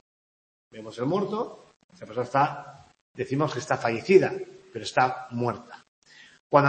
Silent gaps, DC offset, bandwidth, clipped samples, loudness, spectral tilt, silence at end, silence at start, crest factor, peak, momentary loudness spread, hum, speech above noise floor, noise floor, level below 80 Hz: 1.76-1.89 s, 3.01-3.14 s, 5.88-6.02 s, 6.40-6.50 s; under 0.1%; 8.8 kHz; under 0.1%; -26 LUFS; -6 dB/octave; 0 s; 0.75 s; 24 dB; -2 dBFS; 19 LU; none; over 64 dB; under -90 dBFS; -70 dBFS